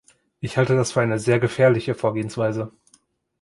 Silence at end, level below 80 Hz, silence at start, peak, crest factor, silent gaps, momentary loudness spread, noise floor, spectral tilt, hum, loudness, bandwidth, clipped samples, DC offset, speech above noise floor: 0.75 s; -56 dBFS; 0.4 s; -4 dBFS; 18 dB; none; 11 LU; -61 dBFS; -6 dB/octave; none; -21 LUFS; 11.5 kHz; under 0.1%; under 0.1%; 41 dB